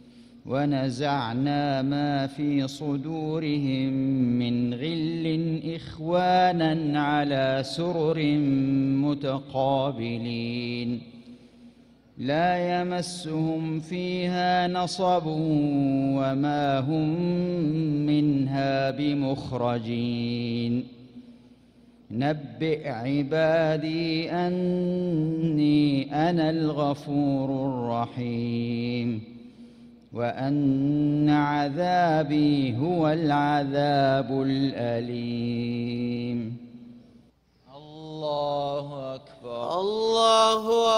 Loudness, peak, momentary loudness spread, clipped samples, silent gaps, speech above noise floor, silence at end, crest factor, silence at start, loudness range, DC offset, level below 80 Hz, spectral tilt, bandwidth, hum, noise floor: -26 LUFS; -8 dBFS; 8 LU; under 0.1%; none; 35 dB; 0 s; 18 dB; 0.05 s; 6 LU; under 0.1%; -60 dBFS; -6.5 dB/octave; 11 kHz; none; -60 dBFS